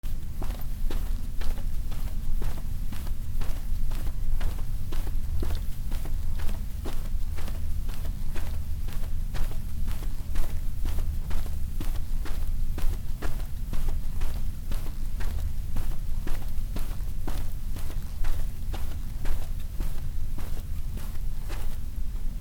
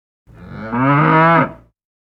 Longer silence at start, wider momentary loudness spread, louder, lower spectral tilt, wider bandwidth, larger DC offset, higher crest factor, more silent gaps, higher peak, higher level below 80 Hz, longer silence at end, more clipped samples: second, 0.05 s vs 0.4 s; second, 3 LU vs 13 LU; second, -36 LUFS vs -14 LUFS; second, -5.5 dB/octave vs -9.5 dB/octave; first, 16.5 kHz vs 5.4 kHz; neither; about the same, 12 dB vs 16 dB; neither; second, -10 dBFS vs 0 dBFS; first, -28 dBFS vs -48 dBFS; second, 0 s vs 0.65 s; neither